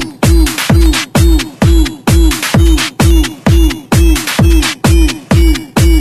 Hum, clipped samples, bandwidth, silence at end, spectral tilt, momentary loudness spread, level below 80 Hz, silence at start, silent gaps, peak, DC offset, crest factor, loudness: none; 0.3%; 14 kHz; 0 s; -5 dB/octave; 2 LU; -10 dBFS; 0 s; none; 0 dBFS; under 0.1%; 8 dB; -10 LUFS